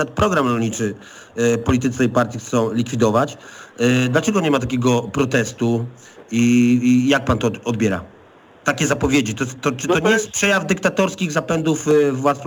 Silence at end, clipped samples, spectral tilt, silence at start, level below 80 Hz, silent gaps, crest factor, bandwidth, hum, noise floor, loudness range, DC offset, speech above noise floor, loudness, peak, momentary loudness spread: 0 s; under 0.1%; -5 dB/octave; 0 s; -44 dBFS; none; 16 dB; 19 kHz; none; -47 dBFS; 2 LU; under 0.1%; 29 dB; -18 LUFS; -2 dBFS; 8 LU